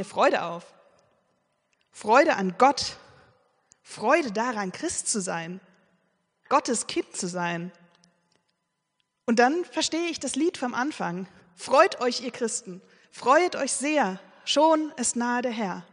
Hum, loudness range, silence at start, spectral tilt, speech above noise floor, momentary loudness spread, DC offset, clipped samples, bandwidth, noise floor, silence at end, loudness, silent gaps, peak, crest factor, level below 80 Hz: none; 5 LU; 0 s; -3 dB/octave; 53 dB; 15 LU; under 0.1%; under 0.1%; 10.5 kHz; -78 dBFS; 0.1 s; -25 LUFS; none; -4 dBFS; 22 dB; -70 dBFS